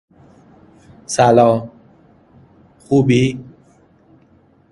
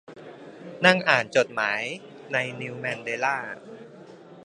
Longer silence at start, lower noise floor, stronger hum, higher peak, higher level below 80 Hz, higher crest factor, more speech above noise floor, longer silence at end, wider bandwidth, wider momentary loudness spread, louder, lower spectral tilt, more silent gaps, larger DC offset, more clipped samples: first, 1.1 s vs 0.1 s; first, -52 dBFS vs -46 dBFS; neither; about the same, 0 dBFS vs 0 dBFS; first, -52 dBFS vs -74 dBFS; second, 18 dB vs 26 dB; first, 39 dB vs 21 dB; first, 1.3 s vs 0 s; about the same, 11.5 kHz vs 10.5 kHz; second, 16 LU vs 24 LU; first, -15 LUFS vs -24 LUFS; first, -6 dB/octave vs -4 dB/octave; neither; neither; neither